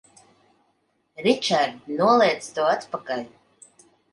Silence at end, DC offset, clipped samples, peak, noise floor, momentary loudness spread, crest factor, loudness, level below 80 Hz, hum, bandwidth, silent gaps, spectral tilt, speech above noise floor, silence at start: 0.85 s; under 0.1%; under 0.1%; -6 dBFS; -69 dBFS; 13 LU; 20 dB; -22 LUFS; -72 dBFS; none; 11.5 kHz; none; -4 dB/octave; 47 dB; 1.2 s